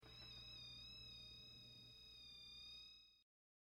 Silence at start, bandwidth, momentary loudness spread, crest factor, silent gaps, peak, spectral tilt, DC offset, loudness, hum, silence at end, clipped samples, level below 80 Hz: 0 s; 16 kHz; 5 LU; 12 dB; none; -48 dBFS; -2.5 dB/octave; under 0.1%; -57 LUFS; none; 0.5 s; under 0.1%; -74 dBFS